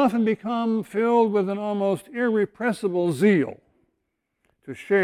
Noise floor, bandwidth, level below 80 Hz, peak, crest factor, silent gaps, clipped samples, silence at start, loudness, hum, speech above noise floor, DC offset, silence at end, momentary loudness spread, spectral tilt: -77 dBFS; 15 kHz; -68 dBFS; -8 dBFS; 16 dB; none; under 0.1%; 0 s; -23 LUFS; none; 55 dB; under 0.1%; 0 s; 6 LU; -7 dB/octave